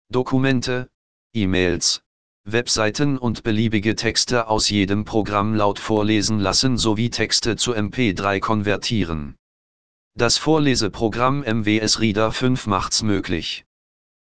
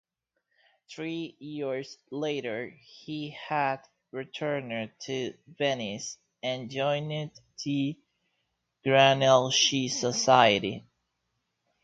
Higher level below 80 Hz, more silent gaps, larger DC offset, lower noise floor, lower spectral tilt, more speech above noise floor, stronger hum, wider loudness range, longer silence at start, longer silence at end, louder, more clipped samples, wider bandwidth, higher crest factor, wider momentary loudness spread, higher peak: first, -42 dBFS vs -70 dBFS; first, 0.94-1.30 s, 2.06-2.44 s, 9.39-10.11 s vs none; first, 2% vs under 0.1%; first, under -90 dBFS vs -80 dBFS; about the same, -4 dB/octave vs -3.5 dB/octave; first, over 70 dB vs 52 dB; neither; second, 2 LU vs 10 LU; second, 0.05 s vs 0.9 s; second, 0.65 s vs 1.05 s; first, -20 LUFS vs -27 LUFS; neither; first, 10 kHz vs 9 kHz; second, 18 dB vs 24 dB; second, 7 LU vs 19 LU; about the same, -2 dBFS vs -4 dBFS